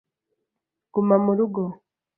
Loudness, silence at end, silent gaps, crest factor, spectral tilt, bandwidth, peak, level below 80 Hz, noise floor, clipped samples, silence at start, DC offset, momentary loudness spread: -22 LUFS; 0.45 s; none; 20 dB; -15 dB/octave; 2.8 kHz; -6 dBFS; -70 dBFS; -84 dBFS; under 0.1%; 0.95 s; under 0.1%; 10 LU